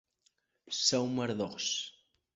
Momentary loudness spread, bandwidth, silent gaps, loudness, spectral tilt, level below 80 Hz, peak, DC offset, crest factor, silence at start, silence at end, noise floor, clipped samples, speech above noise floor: 10 LU; 8 kHz; none; -32 LUFS; -3 dB/octave; -72 dBFS; -14 dBFS; under 0.1%; 20 dB; 0.65 s; 0.45 s; -75 dBFS; under 0.1%; 42 dB